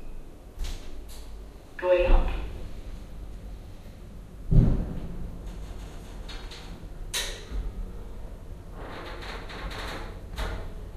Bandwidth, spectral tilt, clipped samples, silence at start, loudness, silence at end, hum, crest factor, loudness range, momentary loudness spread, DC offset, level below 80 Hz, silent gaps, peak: 15 kHz; -5.5 dB/octave; under 0.1%; 0 s; -32 LUFS; 0 s; none; 24 dB; 8 LU; 21 LU; under 0.1%; -32 dBFS; none; -6 dBFS